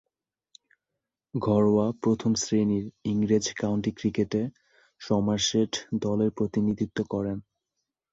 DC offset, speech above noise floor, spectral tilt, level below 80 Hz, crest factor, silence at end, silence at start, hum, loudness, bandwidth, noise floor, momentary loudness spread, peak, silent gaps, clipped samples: under 0.1%; 60 dB; -5.5 dB/octave; -56 dBFS; 16 dB; 0.7 s; 1.35 s; none; -27 LUFS; 7.8 kHz; -86 dBFS; 7 LU; -10 dBFS; none; under 0.1%